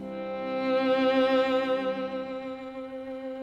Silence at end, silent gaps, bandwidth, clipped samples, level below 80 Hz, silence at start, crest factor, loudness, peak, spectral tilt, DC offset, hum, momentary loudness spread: 0 s; none; 7.6 kHz; under 0.1%; -66 dBFS; 0 s; 14 dB; -28 LUFS; -14 dBFS; -6 dB/octave; under 0.1%; none; 14 LU